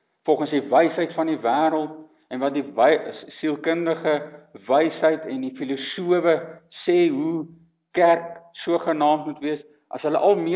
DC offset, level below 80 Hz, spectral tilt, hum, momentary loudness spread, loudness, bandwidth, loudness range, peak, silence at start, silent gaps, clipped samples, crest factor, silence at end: under 0.1%; -78 dBFS; -9.5 dB/octave; none; 14 LU; -22 LUFS; 4 kHz; 2 LU; -6 dBFS; 0.25 s; none; under 0.1%; 18 dB; 0 s